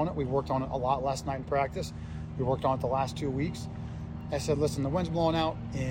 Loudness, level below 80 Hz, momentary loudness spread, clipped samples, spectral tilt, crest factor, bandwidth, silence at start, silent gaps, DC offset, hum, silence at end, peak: -31 LUFS; -46 dBFS; 11 LU; under 0.1%; -6.5 dB/octave; 16 dB; 16 kHz; 0 s; none; under 0.1%; none; 0 s; -14 dBFS